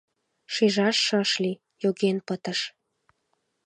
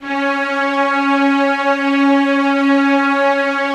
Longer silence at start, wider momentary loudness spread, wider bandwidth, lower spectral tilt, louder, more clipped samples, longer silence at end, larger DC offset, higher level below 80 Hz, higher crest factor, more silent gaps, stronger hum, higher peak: first, 0.5 s vs 0 s; first, 9 LU vs 4 LU; first, 10 kHz vs 9 kHz; about the same, -4 dB/octave vs -3.5 dB/octave; second, -25 LUFS vs -14 LUFS; neither; first, 0.95 s vs 0 s; neither; second, -78 dBFS vs -66 dBFS; first, 18 dB vs 12 dB; neither; neither; second, -10 dBFS vs -2 dBFS